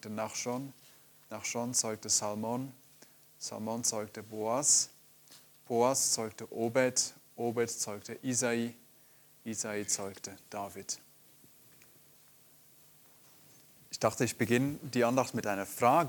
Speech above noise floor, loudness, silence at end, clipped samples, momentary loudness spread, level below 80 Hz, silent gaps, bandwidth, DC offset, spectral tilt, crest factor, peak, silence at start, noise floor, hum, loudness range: 29 dB; -32 LUFS; 0 s; under 0.1%; 14 LU; -76 dBFS; none; 19 kHz; under 0.1%; -3 dB/octave; 22 dB; -12 dBFS; 0.05 s; -61 dBFS; none; 11 LU